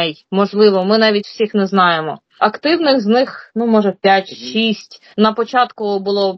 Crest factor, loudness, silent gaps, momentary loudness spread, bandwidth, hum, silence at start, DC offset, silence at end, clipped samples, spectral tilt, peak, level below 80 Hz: 14 dB; -15 LUFS; none; 8 LU; 6.2 kHz; none; 0 s; under 0.1%; 0 s; under 0.1%; -6 dB/octave; 0 dBFS; -66 dBFS